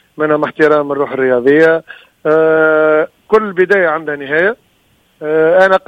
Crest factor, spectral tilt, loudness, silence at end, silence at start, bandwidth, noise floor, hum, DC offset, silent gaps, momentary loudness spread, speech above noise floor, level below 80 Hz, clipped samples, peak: 12 dB; -7 dB/octave; -12 LUFS; 0.1 s; 0.2 s; 8 kHz; -54 dBFS; none; under 0.1%; none; 8 LU; 43 dB; -54 dBFS; under 0.1%; 0 dBFS